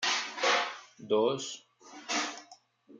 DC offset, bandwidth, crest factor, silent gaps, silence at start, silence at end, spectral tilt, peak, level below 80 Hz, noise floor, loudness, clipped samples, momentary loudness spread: under 0.1%; 9.6 kHz; 18 dB; none; 0 s; 0 s; -1.5 dB/octave; -14 dBFS; -86 dBFS; -58 dBFS; -31 LUFS; under 0.1%; 20 LU